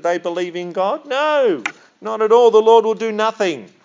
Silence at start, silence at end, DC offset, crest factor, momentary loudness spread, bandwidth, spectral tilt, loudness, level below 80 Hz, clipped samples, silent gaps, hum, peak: 0.05 s; 0.2 s; under 0.1%; 16 dB; 13 LU; 7.6 kHz; -4.5 dB/octave; -16 LUFS; -86 dBFS; under 0.1%; none; none; 0 dBFS